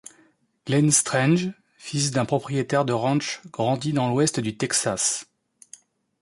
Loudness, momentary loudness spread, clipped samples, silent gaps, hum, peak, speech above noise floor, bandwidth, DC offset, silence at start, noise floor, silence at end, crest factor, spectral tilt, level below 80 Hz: -23 LUFS; 12 LU; under 0.1%; none; none; -6 dBFS; 38 dB; 11.5 kHz; under 0.1%; 0.65 s; -61 dBFS; 1 s; 18 dB; -4 dB/octave; -62 dBFS